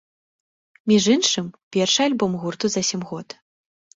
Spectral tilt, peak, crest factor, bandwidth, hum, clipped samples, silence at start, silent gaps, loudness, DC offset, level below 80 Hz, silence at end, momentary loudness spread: -3.5 dB/octave; -6 dBFS; 18 dB; 8 kHz; none; under 0.1%; 0.85 s; 1.63-1.71 s; -20 LUFS; under 0.1%; -62 dBFS; 0.7 s; 14 LU